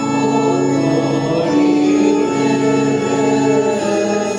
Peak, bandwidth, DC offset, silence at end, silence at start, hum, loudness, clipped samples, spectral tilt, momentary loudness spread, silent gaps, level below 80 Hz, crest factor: -4 dBFS; 10.5 kHz; under 0.1%; 0 s; 0 s; none; -15 LUFS; under 0.1%; -6 dB/octave; 3 LU; none; -54 dBFS; 12 dB